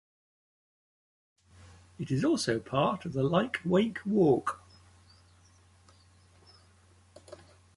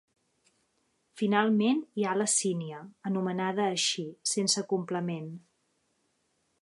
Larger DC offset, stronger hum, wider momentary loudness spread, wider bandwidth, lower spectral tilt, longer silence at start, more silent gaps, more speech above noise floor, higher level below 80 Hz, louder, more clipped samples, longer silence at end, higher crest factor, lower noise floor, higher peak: neither; neither; first, 17 LU vs 12 LU; about the same, 11.5 kHz vs 11.5 kHz; first, -6 dB/octave vs -3.5 dB/octave; first, 2 s vs 1.15 s; neither; second, 33 dB vs 46 dB; first, -64 dBFS vs -80 dBFS; about the same, -29 LUFS vs -29 LUFS; neither; second, 0.4 s vs 1.25 s; about the same, 20 dB vs 22 dB; second, -61 dBFS vs -75 dBFS; about the same, -12 dBFS vs -10 dBFS